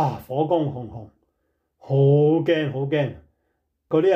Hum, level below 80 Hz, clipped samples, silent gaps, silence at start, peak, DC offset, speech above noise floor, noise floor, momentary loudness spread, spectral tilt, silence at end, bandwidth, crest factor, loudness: none; -60 dBFS; under 0.1%; none; 0 s; -8 dBFS; under 0.1%; 52 dB; -73 dBFS; 14 LU; -9 dB/octave; 0 s; 6 kHz; 14 dB; -21 LUFS